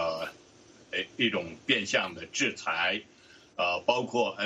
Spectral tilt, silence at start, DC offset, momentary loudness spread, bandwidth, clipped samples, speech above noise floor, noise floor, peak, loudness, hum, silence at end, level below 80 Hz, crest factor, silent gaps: -2.5 dB/octave; 0 s; under 0.1%; 9 LU; 13 kHz; under 0.1%; 27 dB; -56 dBFS; -8 dBFS; -29 LUFS; none; 0 s; -70 dBFS; 22 dB; none